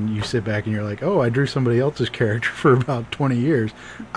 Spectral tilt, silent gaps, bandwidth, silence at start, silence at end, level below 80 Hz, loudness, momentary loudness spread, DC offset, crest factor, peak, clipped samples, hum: -7 dB/octave; none; 10.5 kHz; 0 s; 0 s; -50 dBFS; -21 LUFS; 7 LU; 0.1%; 16 dB; -4 dBFS; under 0.1%; none